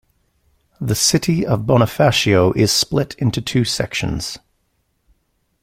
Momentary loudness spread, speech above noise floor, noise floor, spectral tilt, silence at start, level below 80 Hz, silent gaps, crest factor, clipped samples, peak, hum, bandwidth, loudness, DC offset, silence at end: 10 LU; 50 dB; -67 dBFS; -4.5 dB/octave; 0.8 s; -42 dBFS; none; 18 dB; under 0.1%; -2 dBFS; none; 16.5 kHz; -17 LUFS; under 0.1%; 1.25 s